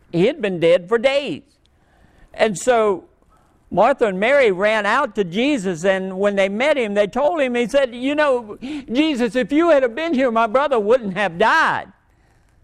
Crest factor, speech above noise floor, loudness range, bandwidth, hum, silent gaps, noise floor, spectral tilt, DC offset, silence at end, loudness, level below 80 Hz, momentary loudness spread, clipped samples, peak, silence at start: 18 dB; 38 dB; 3 LU; 12 kHz; none; none; -56 dBFS; -5 dB/octave; under 0.1%; 0.8 s; -18 LUFS; -52 dBFS; 7 LU; under 0.1%; -2 dBFS; 0.15 s